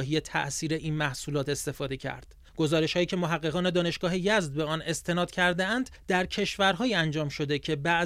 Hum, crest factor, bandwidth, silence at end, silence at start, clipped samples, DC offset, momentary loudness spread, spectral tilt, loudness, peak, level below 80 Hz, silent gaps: none; 18 dB; 15.5 kHz; 0 s; 0 s; under 0.1%; under 0.1%; 6 LU; -4.5 dB/octave; -28 LUFS; -10 dBFS; -52 dBFS; none